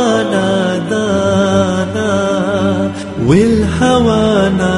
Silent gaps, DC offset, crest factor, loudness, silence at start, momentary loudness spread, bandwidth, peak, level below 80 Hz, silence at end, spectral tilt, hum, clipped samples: none; under 0.1%; 12 dB; -13 LUFS; 0 s; 5 LU; 11.5 kHz; 0 dBFS; -34 dBFS; 0 s; -6 dB/octave; none; under 0.1%